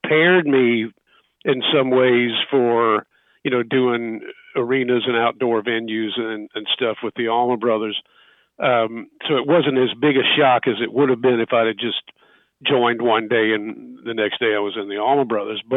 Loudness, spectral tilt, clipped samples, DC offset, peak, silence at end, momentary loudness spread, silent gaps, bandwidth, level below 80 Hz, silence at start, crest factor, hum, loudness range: -19 LUFS; -8.5 dB/octave; under 0.1%; under 0.1%; -4 dBFS; 0 s; 11 LU; none; 4 kHz; -70 dBFS; 0.05 s; 16 dB; none; 4 LU